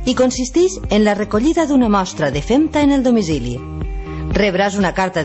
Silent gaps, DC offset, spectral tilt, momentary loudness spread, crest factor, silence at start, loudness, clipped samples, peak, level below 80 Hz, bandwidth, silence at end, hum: none; under 0.1%; -5.5 dB/octave; 11 LU; 14 dB; 0 s; -16 LUFS; under 0.1%; -2 dBFS; -30 dBFS; 8.4 kHz; 0 s; none